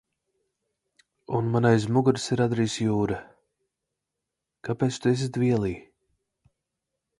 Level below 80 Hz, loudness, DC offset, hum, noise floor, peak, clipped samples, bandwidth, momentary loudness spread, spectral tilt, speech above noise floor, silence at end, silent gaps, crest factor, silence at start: -56 dBFS; -25 LUFS; under 0.1%; none; -85 dBFS; -6 dBFS; under 0.1%; 11.5 kHz; 11 LU; -6.5 dB/octave; 61 dB; 1.4 s; none; 20 dB; 1.3 s